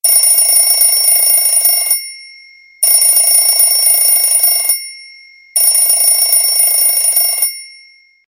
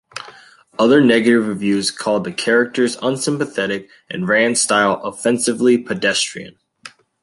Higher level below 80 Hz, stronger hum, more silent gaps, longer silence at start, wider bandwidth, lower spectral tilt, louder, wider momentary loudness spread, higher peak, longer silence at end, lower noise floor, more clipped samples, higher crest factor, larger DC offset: about the same, -62 dBFS vs -62 dBFS; neither; neither; about the same, 0.05 s vs 0.15 s; first, 16.5 kHz vs 11.5 kHz; second, 5.5 dB/octave vs -3.5 dB/octave; first, -8 LUFS vs -17 LUFS; second, 8 LU vs 13 LU; about the same, 0 dBFS vs 0 dBFS; first, 0.6 s vs 0.35 s; about the same, -44 dBFS vs -46 dBFS; neither; about the same, 12 dB vs 16 dB; neither